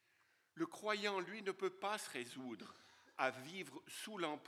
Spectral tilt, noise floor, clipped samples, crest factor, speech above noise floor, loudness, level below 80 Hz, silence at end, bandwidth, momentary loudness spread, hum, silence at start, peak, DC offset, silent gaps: -3.5 dB/octave; -77 dBFS; under 0.1%; 24 dB; 33 dB; -44 LUFS; under -90 dBFS; 0 s; 16 kHz; 14 LU; none; 0.55 s; -22 dBFS; under 0.1%; none